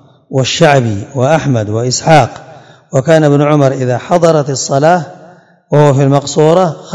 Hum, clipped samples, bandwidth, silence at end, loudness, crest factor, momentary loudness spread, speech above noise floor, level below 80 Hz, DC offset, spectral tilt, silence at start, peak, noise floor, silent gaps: none; 2%; 12 kHz; 0 s; -10 LUFS; 10 dB; 7 LU; 30 dB; -50 dBFS; under 0.1%; -5.5 dB/octave; 0.3 s; 0 dBFS; -39 dBFS; none